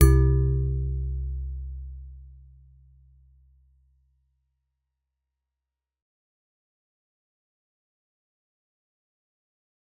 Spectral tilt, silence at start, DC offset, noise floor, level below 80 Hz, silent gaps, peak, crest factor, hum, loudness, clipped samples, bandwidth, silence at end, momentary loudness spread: -9 dB/octave; 0 s; under 0.1%; -88 dBFS; -32 dBFS; none; -2 dBFS; 26 dB; none; -26 LUFS; under 0.1%; 4 kHz; 7.7 s; 23 LU